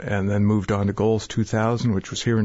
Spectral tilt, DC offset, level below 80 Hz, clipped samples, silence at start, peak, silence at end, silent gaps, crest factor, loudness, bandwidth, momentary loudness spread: -6.5 dB/octave; under 0.1%; -46 dBFS; under 0.1%; 0 s; -8 dBFS; 0 s; none; 12 dB; -22 LUFS; 8 kHz; 3 LU